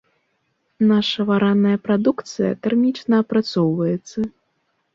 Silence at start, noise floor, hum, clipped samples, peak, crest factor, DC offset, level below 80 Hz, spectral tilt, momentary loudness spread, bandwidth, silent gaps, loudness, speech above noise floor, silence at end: 0.8 s; -69 dBFS; none; under 0.1%; -6 dBFS; 14 dB; under 0.1%; -62 dBFS; -7 dB/octave; 7 LU; 7.4 kHz; none; -19 LUFS; 51 dB; 0.65 s